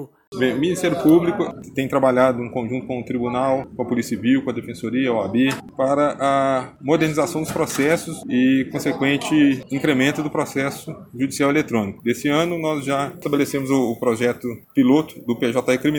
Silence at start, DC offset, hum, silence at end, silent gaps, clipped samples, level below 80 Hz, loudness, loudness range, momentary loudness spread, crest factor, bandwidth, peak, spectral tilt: 0 s; under 0.1%; none; 0 s; 0.27-0.32 s; under 0.1%; -56 dBFS; -20 LUFS; 2 LU; 9 LU; 18 dB; 19 kHz; -2 dBFS; -5.5 dB/octave